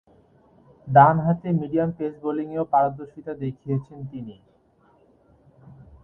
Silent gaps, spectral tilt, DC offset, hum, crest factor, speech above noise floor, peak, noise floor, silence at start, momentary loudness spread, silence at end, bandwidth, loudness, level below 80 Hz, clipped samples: none; -11 dB/octave; under 0.1%; none; 24 dB; 38 dB; 0 dBFS; -60 dBFS; 0.85 s; 21 LU; 1.7 s; 4 kHz; -22 LUFS; -58 dBFS; under 0.1%